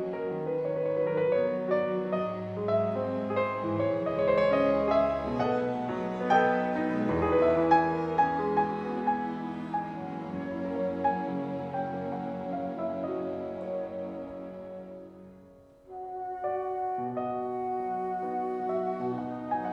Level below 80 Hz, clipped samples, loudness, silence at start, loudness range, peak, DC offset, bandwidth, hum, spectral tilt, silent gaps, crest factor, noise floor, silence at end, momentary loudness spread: -60 dBFS; under 0.1%; -30 LUFS; 0 s; 10 LU; -12 dBFS; under 0.1%; 8 kHz; none; -8 dB/octave; none; 18 dB; -54 dBFS; 0 s; 12 LU